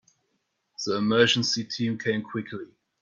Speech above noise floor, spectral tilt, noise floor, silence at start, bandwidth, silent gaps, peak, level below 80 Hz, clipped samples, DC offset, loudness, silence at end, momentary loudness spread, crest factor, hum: 50 dB; -4 dB/octave; -76 dBFS; 0.8 s; 7.6 kHz; none; -6 dBFS; -68 dBFS; under 0.1%; under 0.1%; -25 LUFS; 0.35 s; 18 LU; 22 dB; none